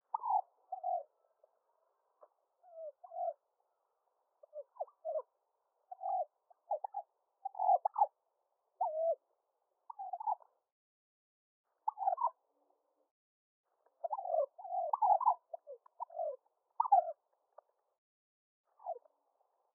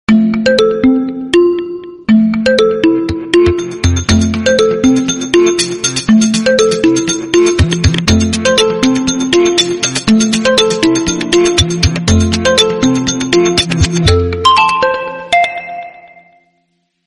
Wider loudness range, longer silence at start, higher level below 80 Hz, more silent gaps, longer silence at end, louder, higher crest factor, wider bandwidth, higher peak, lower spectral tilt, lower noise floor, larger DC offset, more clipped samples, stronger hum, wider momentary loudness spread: first, 11 LU vs 1 LU; about the same, 0.15 s vs 0.1 s; second, under -90 dBFS vs -28 dBFS; first, 10.72-11.64 s, 13.11-13.64 s, 17.98-18.64 s vs none; second, 0.75 s vs 1.15 s; second, -38 LUFS vs -11 LUFS; first, 22 dB vs 10 dB; second, 1.8 kHz vs 11.5 kHz; second, -18 dBFS vs 0 dBFS; second, 24.5 dB/octave vs -4.5 dB/octave; first, -83 dBFS vs -62 dBFS; neither; neither; neither; first, 20 LU vs 4 LU